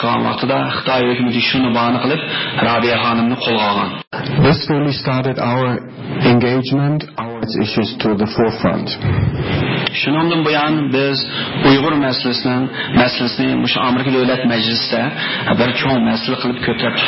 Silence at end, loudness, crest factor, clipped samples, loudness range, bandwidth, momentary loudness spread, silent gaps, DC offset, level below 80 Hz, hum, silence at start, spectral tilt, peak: 0 s; -16 LUFS; 14 dB; under 0.1%; 2 LU; 5.8 kHz; 5 LU; 4.07-4.11 s; under 0.1%; -40 dBFS; none; 0 s; -10 dB/octave; -2 dBFS